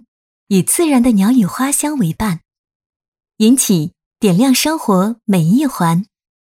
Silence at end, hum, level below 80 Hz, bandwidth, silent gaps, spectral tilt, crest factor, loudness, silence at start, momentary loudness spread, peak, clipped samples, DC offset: 0.5 s; none; -48 dBFS; 16.5 kHz; 2.58-2.64 s, 2.75-2.80 s, 2.86-2.90 s, 2.96-3.00 s, 3.08-3.12 s, 4.06-4.11 s; -5 dB/octave; 14 dB; -14 LUFS; 0.5 s; 8 LU; 0 dBFS; under 0.1%; under 0.1%